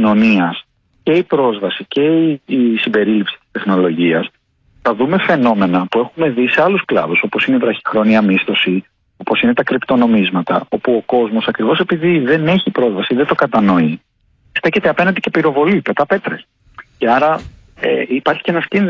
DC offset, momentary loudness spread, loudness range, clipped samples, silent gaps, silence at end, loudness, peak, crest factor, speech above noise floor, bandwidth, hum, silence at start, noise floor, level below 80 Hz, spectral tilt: under 0.1%; 7 LU; 2 LU; under 0.1%; none; 0 s; -14 LUFS; -2 dBFS; 12 dB; 41 dB; 7 kHz; none; 0 s; -54 dBFS; -52 dBFS; -8 dB/octave